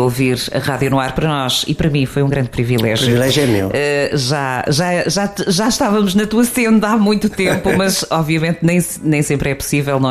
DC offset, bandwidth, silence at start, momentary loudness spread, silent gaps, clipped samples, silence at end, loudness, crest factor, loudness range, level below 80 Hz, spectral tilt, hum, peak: under 0.1%; 15.5 kHz; 0 s; 4 LU; none; under 0.1%; 0 s; -15 LUFS; 12 dB; 1 LU; -38 dBFS; -5 dB/octave; none; -2 dBFS